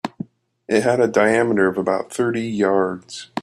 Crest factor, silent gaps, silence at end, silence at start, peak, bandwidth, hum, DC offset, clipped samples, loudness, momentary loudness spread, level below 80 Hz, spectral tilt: 18 dB; none; 0 s; 0.05 s; -2 dBFS; 13 kHz; none; under 0.1%; under 0.1%; -19 LUFS; 15 LU; -62 dBFS; -5.5 dB/octave